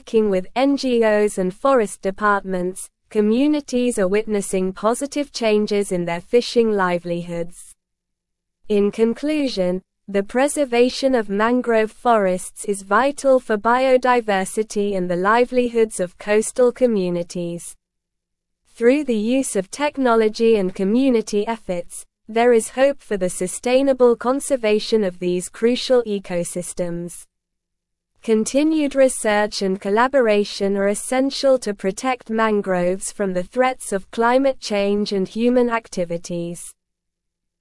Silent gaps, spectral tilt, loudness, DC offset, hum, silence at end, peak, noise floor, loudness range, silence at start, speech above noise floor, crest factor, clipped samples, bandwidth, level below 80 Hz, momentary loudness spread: none; -4.5 dB/octave; -19 LUFS; under 0.1%; none; 0.9 s; -4 dBFS; -79 dBFS; 4 LU; 0.05 s; 60 dB; 16 dB; under 0.1%; 12 kHz; -50 dBFS; 9 LU